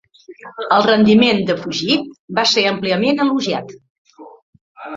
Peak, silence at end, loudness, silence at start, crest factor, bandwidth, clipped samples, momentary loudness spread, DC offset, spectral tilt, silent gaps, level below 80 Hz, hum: -2 dBFS; 0 s; -15 LUFS; 0.3 s; 16 dB; 7.6 kHz; under 0.1%; 13 LU; under 0.1%; -4.5 dB/octave; 2.19-2.28 s, 3.90-4.05 s, 4.42-4.53 s, 4.61-4.75 s; -56 dBFS; none